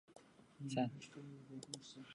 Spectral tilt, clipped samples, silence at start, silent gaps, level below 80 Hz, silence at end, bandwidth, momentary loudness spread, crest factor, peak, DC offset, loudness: -5.5 dB/octave; under 0.1%; 0.1 s; none; -84 dBFS; 0 s; 11 kHz; 23 LU; 22 dB; -26 dBFS; under 0.1%; -47 LUFS